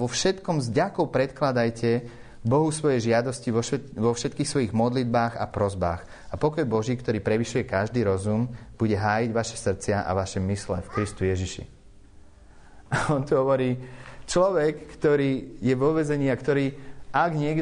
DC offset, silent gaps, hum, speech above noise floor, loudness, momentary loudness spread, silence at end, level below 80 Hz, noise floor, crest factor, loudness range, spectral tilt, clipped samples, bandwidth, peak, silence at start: under 0.1%; none; none; 24 dB; -25 LUFS; 7 LU; 0 s; -48 dBFS; -49 dBFS; 16 dB; 4 LU; -6 dB/octave; under 0.1%; 10 kHz; -10 dBFS; 0 s